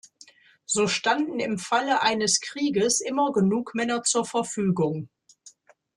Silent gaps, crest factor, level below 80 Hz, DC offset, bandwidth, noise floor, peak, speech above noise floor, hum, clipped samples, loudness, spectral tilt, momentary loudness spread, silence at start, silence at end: none; 18 dB; -66 dBFS; under 0.1%; 12.5 kHz; -54 dBFS; -8 dBFS; 30 dB; none; under 0.1%; -24 LUFS; -3.5 dB/octave; 6 LU; 0.7 s; 0.5 s